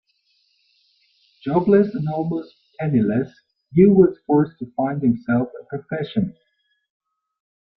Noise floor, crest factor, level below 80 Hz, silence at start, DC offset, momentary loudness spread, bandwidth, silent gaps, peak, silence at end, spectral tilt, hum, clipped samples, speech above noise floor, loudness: -66 dBFS; 20 dB; -56 dBFS; 1.45 s; under 0.1%; 14 LU; 5.4 kHz; none; -2 dBFS; 1.45 s; -11.5 dB/octave; none; under 0.1%; 47 dB; -20 LUFS